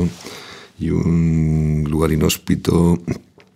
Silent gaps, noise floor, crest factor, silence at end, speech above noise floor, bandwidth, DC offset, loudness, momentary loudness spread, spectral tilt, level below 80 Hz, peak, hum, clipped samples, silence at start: none; -37 dBFS; 16 dB; 0.35 s; 21 dB; 16 kHz; under 0.1%; -18 LUFS; 17 LU; -6.5 dB/octave; -32 dBFS; -2 dBFS; none; under 0.1%; 0 s